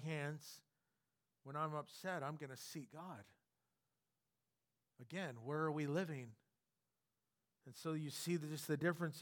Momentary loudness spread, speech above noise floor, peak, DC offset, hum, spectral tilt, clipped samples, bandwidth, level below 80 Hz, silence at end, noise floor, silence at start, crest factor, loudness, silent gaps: 18 LU; over 45 dB; -26 dBFS; under 0.1%; none; -5.5 dB/octave; under 0.1%; 19 kHz; under -90 dBFS; 0 s; under -90 dBFS; 0 s; 22 dB; -45 LUFS; none